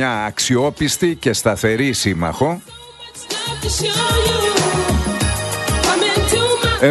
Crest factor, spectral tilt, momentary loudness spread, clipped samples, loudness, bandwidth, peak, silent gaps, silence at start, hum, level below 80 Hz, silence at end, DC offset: 16 dB; -3.5 dB/octave; 8 LU; under 0.1%; -17 LUFS; 12.5 kHz; 0 dBFS; none; 0 s; none; -30 dBFS; 0 s; under 0.1%